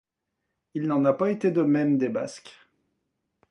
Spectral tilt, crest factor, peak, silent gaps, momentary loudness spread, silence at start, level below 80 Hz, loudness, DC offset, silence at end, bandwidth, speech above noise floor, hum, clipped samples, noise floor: -7.5 dB/octave; 18 dB; -8 dBFS; none; 14 LU; 0.75 s; -74 dBFS; -24 LUFS; under 0.1%; 1 s; 11 kHz; 57 dB; none; under 0.1%; -82 dBFS